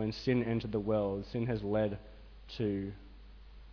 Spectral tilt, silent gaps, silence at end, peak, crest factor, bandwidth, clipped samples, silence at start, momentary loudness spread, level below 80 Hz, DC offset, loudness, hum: -6.5 dB/octave; none; 0 s; -20 dBFS; 16 dB; 5.4 kHz; under 0.1%; 0 s; 15 LU; -52 dBFS; under 0.1%; -34 LUFS; none